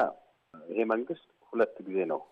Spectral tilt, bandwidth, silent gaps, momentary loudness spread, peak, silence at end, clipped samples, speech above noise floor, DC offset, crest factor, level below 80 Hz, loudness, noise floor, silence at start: -8 dB/octave; 5.8 kHz; none; 10 LU; -14 dBFS; 0.1 s; under 0.1%; 24 dB; under 0.1%; 18 dB; -80 dBFS; -32 LUFS; -55 dBFS; 0 s